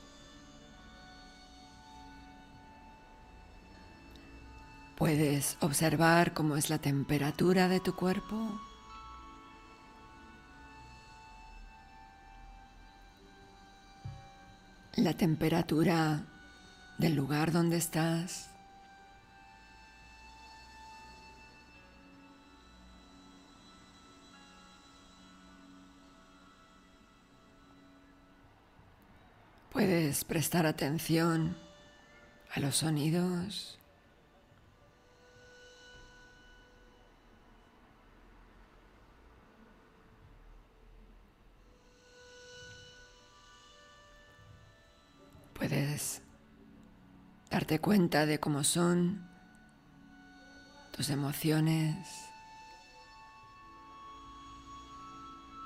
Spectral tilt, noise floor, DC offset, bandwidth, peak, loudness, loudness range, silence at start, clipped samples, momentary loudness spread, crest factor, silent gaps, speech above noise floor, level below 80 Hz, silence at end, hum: -5 dB/octave; -63 dBFS; under 0.1%; 16 kHz; -14 dBFS; -31 LUFS; 24 LU; 0 s; under 0.1%; 27 LU; 24 dB; none; 32 dB; -60 dBFS; 0 s; none